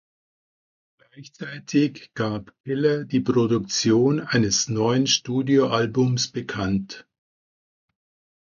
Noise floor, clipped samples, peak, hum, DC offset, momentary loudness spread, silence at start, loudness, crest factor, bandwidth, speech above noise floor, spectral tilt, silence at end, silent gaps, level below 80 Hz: under -90 dBFS; under 0.1%; -6 dBFS; none; under 0.1%; 11 LU; 1.15 s; -22 LUFS; 18 dB; 7.4 kHz; over 68 dB; -4.5 dB/octave; 1.55 s; 2.60-2.64 s; -56 dBFS